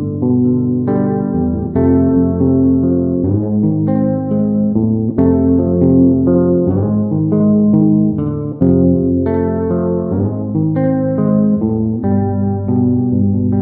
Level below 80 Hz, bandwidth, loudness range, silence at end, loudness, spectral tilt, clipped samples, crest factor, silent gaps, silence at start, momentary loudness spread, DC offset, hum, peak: -38 dBFS; 2.3 kHz; 3 LU; 0 s; -14 LUFS; -15.5 dB/octave; under 0.1%; 12 dB; none; 0 s; 5 LU; under 0.1%; none; 0 dBFS